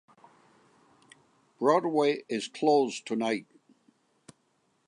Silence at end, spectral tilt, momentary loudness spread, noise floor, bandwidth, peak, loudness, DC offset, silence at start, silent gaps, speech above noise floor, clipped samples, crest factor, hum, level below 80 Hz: 1.45 s; -4.5 dB/octave; 8 LU; -72 dBFS; 10.5 kHz; -10 dBFS; -28 LUFS; under 0.1%; 1.6 s; none; 45 dB; under 0.1%; 22 dB; none; -86 dBFS